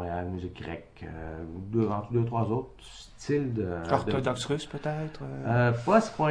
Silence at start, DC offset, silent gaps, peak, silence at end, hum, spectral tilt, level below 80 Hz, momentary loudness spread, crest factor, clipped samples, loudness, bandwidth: 0 s; under 0.1%; none; -8 dBFS; 0 s; none; -7 dB/octave; -52 dBFS; 17 LU; 20 dB; under 0.1%; -29 LUFS; 10.5 kHz